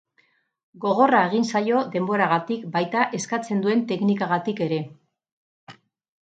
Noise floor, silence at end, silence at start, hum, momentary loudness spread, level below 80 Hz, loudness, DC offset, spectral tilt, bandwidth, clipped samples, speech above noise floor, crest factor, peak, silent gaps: -65 dBFS; 0.55 s; 0.75 s; none; 9 LU; -74 dBFS; -23 LUFS; under 0.1%; -5.5 dB/octave; 9.2 kHz; under 0.1%; 43 dB; 20 dB; -4 dBFS; 5.32-5.67 s